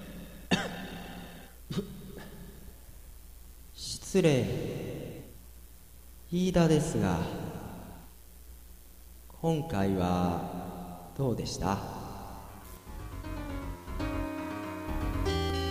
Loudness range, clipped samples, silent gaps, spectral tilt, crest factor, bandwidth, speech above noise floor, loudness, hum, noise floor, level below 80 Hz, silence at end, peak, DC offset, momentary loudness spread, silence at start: 7 LU; under 0.1%; none; -6 dB/octave; 22 dB; 15.5 kHz; 24 dB; -32 LUFS; none; -52 dBFS; -46 dBFS; 0 s; -12 dBFS; 0.2%; 25 LU; 0 s